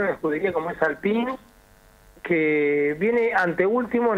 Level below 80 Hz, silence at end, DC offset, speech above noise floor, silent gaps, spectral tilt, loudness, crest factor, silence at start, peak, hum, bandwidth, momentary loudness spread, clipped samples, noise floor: -58 dBFS; 0 s; under 0.1%; 31 dB; none; -7.5 dB/octave; -23 LUFS; 18 dB; 0 s; -6 dBFS; none; 8.8 kHz; 5 LU; under 0.1%; -53 dBFS